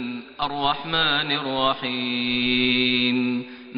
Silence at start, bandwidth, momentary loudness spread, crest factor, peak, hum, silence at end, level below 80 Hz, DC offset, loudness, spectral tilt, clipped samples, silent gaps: 0 s; 5.4 kHz; 9 LU; 16 dB; -8 dBFS; none; 0 s; -52 dBFS; under 0.1%; -22 LUFS; -8.5 dB/octave; under 0.1%; none